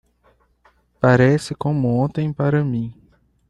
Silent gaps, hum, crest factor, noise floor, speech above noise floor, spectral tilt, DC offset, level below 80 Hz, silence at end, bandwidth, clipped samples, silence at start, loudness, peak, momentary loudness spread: none; none; 18 dB; -59 dBFS; 42 dB; -8 dB/octave; under 0.1%; -50 dBFS; 0.6 s; 11.5 kHz; under 0.1%; 1 s; -19 LUFS; -2 dBFS; 9 LU